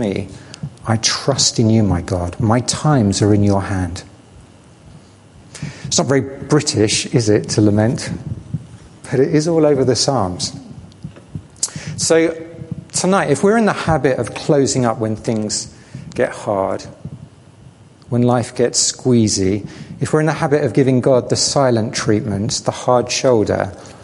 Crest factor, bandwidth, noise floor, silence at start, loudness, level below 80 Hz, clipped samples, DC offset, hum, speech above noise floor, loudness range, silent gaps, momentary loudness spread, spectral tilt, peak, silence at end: 18 dB; 11.5 kHz; -43 dBFS; 0 s; -16 LUFS; -40 dBFS; under 0.1%; under 0.1%; none; 28 dB; 5 LU; none; 17 LU; -4.5 dB/octave; 0 dBFS; 0 s